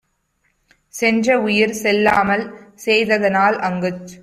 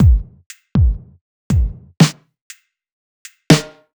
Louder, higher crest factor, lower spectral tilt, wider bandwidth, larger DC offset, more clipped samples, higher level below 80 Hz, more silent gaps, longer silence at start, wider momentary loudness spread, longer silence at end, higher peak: about the same, -17 LUFS vs -17 LUFS; about the same, 16 dB vs 16 dB; about the same, -4.5 dB/octave vs -5.5 dB/octave; second, 15 kHz vs over 20 kHz; neither; neither; second, -54 dBFS vs -22 dBFS; second, none vs 0.46-0.50 s, 1.21-1.50 s, 2.41-2.50 s, 2.92-3.25 s; first, 0.95 s vs 0 s; about the same, 10 LU vs 11 LU; second, 0.05 s vs 0.3 s; about the same, -2 dBFS vs 0 dBFS